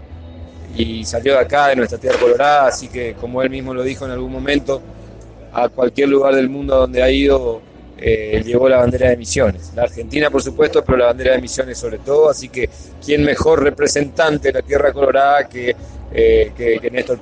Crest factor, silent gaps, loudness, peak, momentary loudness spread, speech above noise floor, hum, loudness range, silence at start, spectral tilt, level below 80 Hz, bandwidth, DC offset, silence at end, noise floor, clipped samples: 14 dB; none; -16 LUFS; -2 dBFS; 11 LU; 21 dB; none; 3 LU; 0 s; -5 dB/octave; -34 dBFS; 9.6 kHz; under 0.1%; 0 s; -36 dBFS; under 0.1%